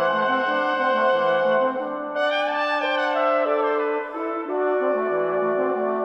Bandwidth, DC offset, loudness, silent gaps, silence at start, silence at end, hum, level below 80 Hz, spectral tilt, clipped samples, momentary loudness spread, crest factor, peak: 7.8 kHz; under 0.1%; -22 LUFS; none; 0 s; 0 s; none; -70 dBFS; -5.5 dB/octave; under 0.1%; 6 LU; 12 dB; -10 dBFS